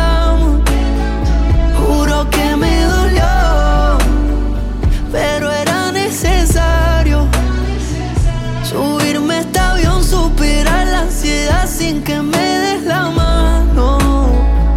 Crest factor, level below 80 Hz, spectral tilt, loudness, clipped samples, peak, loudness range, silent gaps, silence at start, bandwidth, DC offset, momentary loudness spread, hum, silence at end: 8 dB; -14 dBFS; -5 dB/octave; -14 LUFS; under 0.1%; -2 dBFS; 2 LU; none; 0 s; 15.5 kHz; under 0.1%; 4 LU; none; 0 s